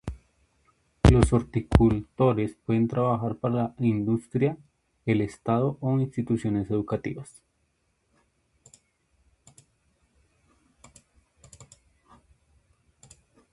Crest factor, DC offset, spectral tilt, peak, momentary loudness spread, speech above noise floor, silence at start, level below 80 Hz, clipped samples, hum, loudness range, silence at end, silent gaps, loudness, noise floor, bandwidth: 26 dB; under 0.1%; -8 dB/octave; 0 dBFS; 10 LU; 47 dB; 0.05 s; -38 dBFS; under 0.1%; none; 9 LU; 1.9 s; none; -25 LUFS; -72 dBFS; 11.5 kHz